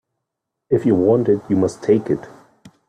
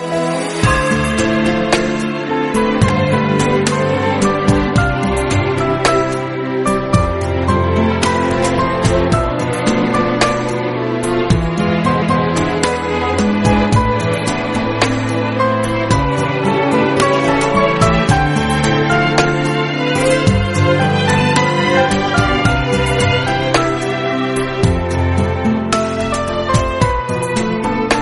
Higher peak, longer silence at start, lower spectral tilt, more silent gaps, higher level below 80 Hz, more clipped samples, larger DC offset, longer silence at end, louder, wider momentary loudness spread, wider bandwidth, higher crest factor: second, -4 dBFS vs 0 dBFS; first, 0.7 s vs 0 s; first, -8.5 dB/octave vs -5.5 dB/octave; neither; second, -58 dBFS vs -30 dBFS; neither; neither; first, 0.6 s vs 0 s; second, -18 LUFS vs -15 LUFS; first, 7 LU vs 4 LU; second, 10 kHz vs 11.5 kHz; about the same, 16 dB vs 14 dB